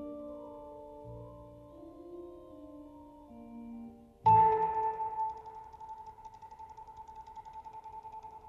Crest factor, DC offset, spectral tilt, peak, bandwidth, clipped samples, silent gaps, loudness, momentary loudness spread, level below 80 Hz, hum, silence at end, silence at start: 20 dB; under 0.1%; -8.5 dB/octave; -16 dBFS; 6.6 kHz; under 0.1%; none; -29 LUFS; 24 LU; -62 dBFS; none; 0 s; 0 s